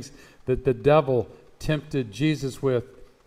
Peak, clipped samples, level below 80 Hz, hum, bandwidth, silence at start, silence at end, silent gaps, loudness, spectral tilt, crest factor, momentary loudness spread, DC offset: -6 dBFS; under 0.1%; -46 dBFS; none; 15 kHz; 0 s; 0.2 s; none; -25 LUFS; -7 dB/octave; 18 dB; 16 LU; under 0.1%